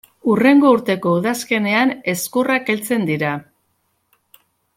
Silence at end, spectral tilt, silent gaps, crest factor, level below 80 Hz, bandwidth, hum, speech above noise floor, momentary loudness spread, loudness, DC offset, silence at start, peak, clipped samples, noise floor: 1.35 s; -5 dB/octave; none; 16 dB; -62 dBFS; 16.5 kHz; none; 50 dB; 9 LU; -17 LUFS; under 0.1%; 0.25 s; -2 dBFS; under 0.1%; -67 dBFS